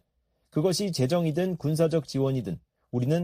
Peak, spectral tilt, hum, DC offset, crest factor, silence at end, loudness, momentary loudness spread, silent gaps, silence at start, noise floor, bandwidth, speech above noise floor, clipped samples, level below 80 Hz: -10 dBFS; -6.5 dB/octave; none; under 0.1%; 16 dB; 0 s; -27 LUFS; 8 LU; none; 0.55 s; -74 dBFS; 15.5 kHz; 48 dB; under 0.1%; -60 dBFS